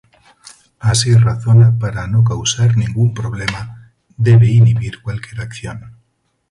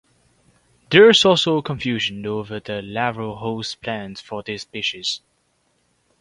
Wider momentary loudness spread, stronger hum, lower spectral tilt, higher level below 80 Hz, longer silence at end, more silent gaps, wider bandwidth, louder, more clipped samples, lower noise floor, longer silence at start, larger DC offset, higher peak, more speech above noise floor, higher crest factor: about the same, 17 LU vs 18 LU; neither; first, -5.5 dB/octave vs -4 dB/octave; first, -40 dBFS vs -56 dBFS; second, 0.6 s vs 1.05 s; neither; about the same, 11.5 kHz vs 11 kHz; first, -14 LUFS vs -19 LUFS; neither; about the same, -64 dBFS vs -66 dBFS; about the same, 0.85 s vs 0.9 s; neither; about the same, 0 dBFS vs 0 dBFS; first, 51 dB vs 46 dB; second, 14 dB vs 22 dB